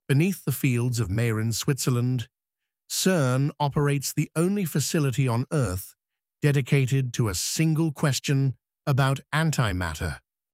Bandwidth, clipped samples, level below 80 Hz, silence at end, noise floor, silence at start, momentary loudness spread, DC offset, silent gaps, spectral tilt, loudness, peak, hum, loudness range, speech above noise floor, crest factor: 16 kHz; under 0.1%; -50 dBFS; 0.35 s; -87 dBFS; 0.1 s; 7 LU; under 0.1%; none; -5.5 dB/octave; -25 LUFS; -8 dBFS; none; 1 LU; 63 dB; 16 dB